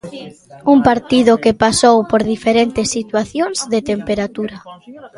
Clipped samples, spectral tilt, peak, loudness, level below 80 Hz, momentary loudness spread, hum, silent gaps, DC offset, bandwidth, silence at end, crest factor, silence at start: under 0.1%; -4 dB/octave; 0 dBFS; -14 LUFS; -44 dBFS; 11 LU; none; none; under 0.1%; 11.5 kHz; 0.1 s; 16 dB; 0.05 s